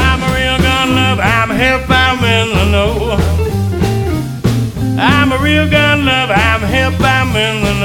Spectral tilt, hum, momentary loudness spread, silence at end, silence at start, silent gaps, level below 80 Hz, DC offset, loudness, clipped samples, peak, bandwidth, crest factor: -5.5 dB/octave; none; 5 LU; 0 s; 0 s; none; -22 dBFS; under 0.1%; -12 LUFS; under 0.1%; 0 dBFS; 17.5 kHz; 12 dB